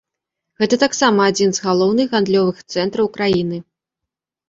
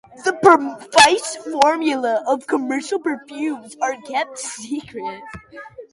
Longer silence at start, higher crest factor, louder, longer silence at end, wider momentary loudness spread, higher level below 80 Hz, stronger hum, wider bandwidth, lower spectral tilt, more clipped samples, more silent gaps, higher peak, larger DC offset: first, 0.6 s vs 0.15 s; about the same, 16 dB vs 20 dB; about the same, -17 LUFS vs -18 LUFS; first, 0.9 s vs 0.1 s; second, 8 LU vs 18 LU; about the same, -56 dBFS vs -60 dBFS; neither; second, 7.8 kHz vs 11.5 kHz; first, -4.5 dB/octave vs -2.5 dB/octave; neither; neither; about the same, -2 dBFS vs 0 dBFS; neither